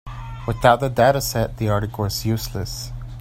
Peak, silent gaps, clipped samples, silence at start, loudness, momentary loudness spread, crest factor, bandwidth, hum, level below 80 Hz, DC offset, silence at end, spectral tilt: 0 dBFS; none; under 0.1%; 0.05 s; -21 LUFS; 14 LU; 20 dB; 16 kHz; none; -36 dBFS; under 0.1%; 0 s; -5 dB/octave